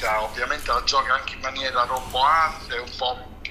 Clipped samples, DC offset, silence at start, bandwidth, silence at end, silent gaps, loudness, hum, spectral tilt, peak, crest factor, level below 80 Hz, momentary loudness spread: under 0.1%; under 0.1%; 0 s; 15.5 kHz; 0 s; none; -23 LUFS; none; -2 dB/octave; -6 dBFS; 18 dB; -40 dBFS; 10 LU